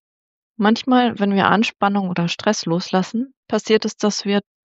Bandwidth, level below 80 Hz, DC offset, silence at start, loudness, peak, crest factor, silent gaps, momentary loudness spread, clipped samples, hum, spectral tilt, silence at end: 8 kHz; -68 dBFS; under 0.1%; 0.6 s; -19 LUFS; -2 dBFS; 18 dB; 3.37-3.43 s; 6 LU; under 0.1%; none; -5 dB/octave; 0.25 s